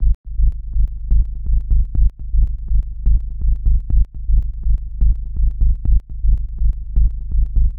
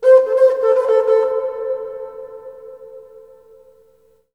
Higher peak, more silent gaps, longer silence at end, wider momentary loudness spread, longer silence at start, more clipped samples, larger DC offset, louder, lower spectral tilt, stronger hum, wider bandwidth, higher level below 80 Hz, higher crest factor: about the same, -4 dBFS vs -2 dBFS; first, 0.15-0.24 s vs none; second, 0 s vs 1.3 s; second, 4 LU vs 25 LU; about the same, 0 s vs 0 s; neither; first, 0.5% vs under 0.1%; second, -21 LUFS vs -16 LUFS; first, -12 dB/octave vs -3.5 dB/octave; neither; second, 0.7 kHz vs 5.6 kHz; first, -16 dBFS vs -64 dBFS; second, 10 dB vs 16 dB